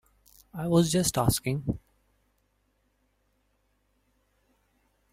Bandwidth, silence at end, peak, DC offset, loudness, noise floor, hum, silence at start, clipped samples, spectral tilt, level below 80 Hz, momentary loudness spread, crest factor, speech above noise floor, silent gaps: 16 kHz; 3.35 s; -10 dBFS; under 0.1%; -27 LUFS; -72 dBFS; 50 Hz at -60 dBFS; 0.55 s; under 0.1%; -5 dB/octave; -52 dBFS; 14 LU; 22 dB; 46 dB; none